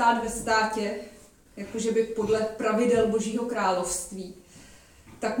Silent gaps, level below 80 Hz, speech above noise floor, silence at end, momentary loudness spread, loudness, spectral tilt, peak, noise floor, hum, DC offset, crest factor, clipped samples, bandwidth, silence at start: none; -54 dBFS; 25 dB; 0 s; 15 LU; -26 LUFS; -4 dB/octave; -8 dBFS; -52 dBFS; none; under 0.1%; 18 dB; under 0.1%; 17 kHz; 0 s